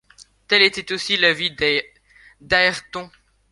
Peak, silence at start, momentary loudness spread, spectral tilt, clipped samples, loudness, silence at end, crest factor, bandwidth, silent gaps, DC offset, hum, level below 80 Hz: 0 dBFS; 0.5 s; 13 LU; -2.5 dB/octave; under 0.1%; -18 LUFS; 0.45 s; 20 dB; 11.5 kHz; none; under 0.1%; none; -52 dBFS